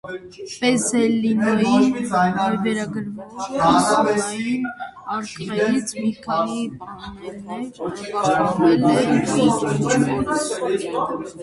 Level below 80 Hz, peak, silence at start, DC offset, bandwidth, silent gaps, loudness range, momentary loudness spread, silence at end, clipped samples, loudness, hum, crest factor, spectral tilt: -52 dBFS; -2 dBFS; 0.05 s; under 0.1%; 11.5 kHz; none; 6 LU; 15 LU; 0 s; under 0.1%; -20 LUFS; none; 18 dB; -5 dB/octave